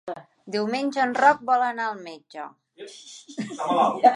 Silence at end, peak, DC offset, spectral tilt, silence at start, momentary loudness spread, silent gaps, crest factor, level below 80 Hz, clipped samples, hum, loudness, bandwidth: 0 s; -4 dBFS; under 0.1%; -4.5 dB/octave; 0.05 s; 22 LU; none; 20 dB; -78 dBFS; under 0.1%; none; -23 LUFS; 11 kHz